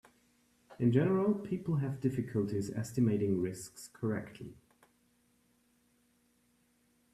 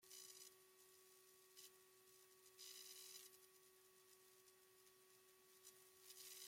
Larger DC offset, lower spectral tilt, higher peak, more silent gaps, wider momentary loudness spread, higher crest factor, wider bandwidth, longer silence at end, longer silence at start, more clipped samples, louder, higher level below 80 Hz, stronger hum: neither; first, -8 dB/octave vs 0.5 dB/octave; first, -16 dBFS vs -44 dBFS; neither; first, 16 LU vs 12 LU; about the same, 20 dB vs 22 dB; second, 13.5 kHz vs 16.5 kHz; first, 2.6 s vs 0 s; first, 0.7 s vs 0 s; neither; first, -33 LUFS vs -63 LUFS; first, -68 dBFS vs under -90 dBFS; neither